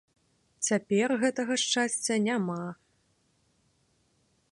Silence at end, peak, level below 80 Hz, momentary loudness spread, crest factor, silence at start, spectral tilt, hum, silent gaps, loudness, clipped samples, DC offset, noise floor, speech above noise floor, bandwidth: 1.8 s; -14 dBFS; -78 dBFS; 7 LU; 18 dB; 0.6 s; -3.5 dB/octave; none; none; -28 LUFS; under 0.1%; under 0.1%; -71 dBFS; 43 dB; 11.5 kHz